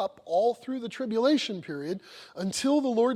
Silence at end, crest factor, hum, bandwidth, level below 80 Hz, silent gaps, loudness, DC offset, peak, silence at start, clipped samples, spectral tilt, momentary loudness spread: 0 s; 14 dB; none; 14 kHz; -72 dBFS; none; -28 LUFS; under 0.1%; -12 dBFS; 0 s; under 0.1%; -4.5 dB/octave; 11 LU